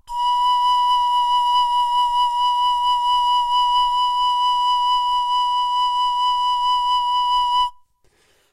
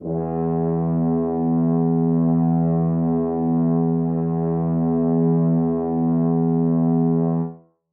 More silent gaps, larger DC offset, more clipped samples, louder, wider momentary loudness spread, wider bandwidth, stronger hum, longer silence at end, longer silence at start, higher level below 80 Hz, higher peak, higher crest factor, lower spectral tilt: neither; neither; neither; about the same, -18 LUFS vs -20 LUFS; about the same, 2 LU vs 4 LU; first, 12.5 kHz vs 2 kHz; neither; first, 0.8 s vs 0.35 s; about the same, 0.1 s vs 0 s; about the same, -48 dBFS vs -48 dBFS; about the same, -10 dBFS vs -10 dBFS; about the same, 8 dB vs 10 dB; second, 3 dB/octave vs -15.5 dB/octave